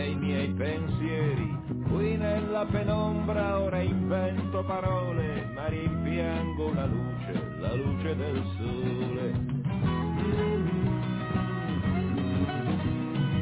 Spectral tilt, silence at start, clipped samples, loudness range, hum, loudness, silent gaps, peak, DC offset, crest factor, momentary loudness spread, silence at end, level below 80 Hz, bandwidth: -11.5 dB/octave; 0 s; under 0.1%; 2 LU; none; -30 LUFS; none; -16 dBFS; under 0.1%; 12 dB; 4 LU; 0 s; -42 dBFS; 4 kHz